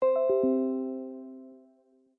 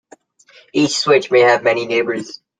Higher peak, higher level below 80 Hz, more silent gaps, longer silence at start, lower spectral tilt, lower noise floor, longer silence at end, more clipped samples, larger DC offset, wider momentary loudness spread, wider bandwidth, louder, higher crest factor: second, -16 dBFS vs -2 dBFS; second, -74 dBFS vs -62 dBFS; neither; second, 0 s vs 0.75 s; first, -10.5 dB/octave vs -3.5 dB/octave; first, -64 dBFS vs -50 dBFS; first, 0.6 s vs 0.25 s; neither; neither; first, 20 LU vs 11 LU; second, 3.9 kHz vs 9.6 kHz; second, -28 LUFS vs -15 LUFS; about the same, 14 dB vs 16 dB